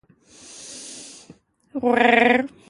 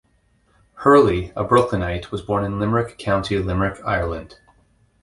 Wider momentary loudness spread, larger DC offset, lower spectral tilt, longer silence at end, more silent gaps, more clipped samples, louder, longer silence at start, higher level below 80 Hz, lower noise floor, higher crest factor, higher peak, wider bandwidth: first, 23 LU vs 10 LU; neither; second, -3.5 dB/octave vs -7 dB/octave; second, 0.2 s vs 0.75 s; neither; neither; first, -17 LUFS vs -20 LUFS; second, 0.55 s vs 0.75 s; second, -64 dBFS vs -38 dBFS; second, -51 dBFS vs -61 dBFS; about the same, 22 dB vs 20 dB; about the same, -2 dBFS vs -2 dBFS; about the same, 11.5 kHz vs 11.5 kHz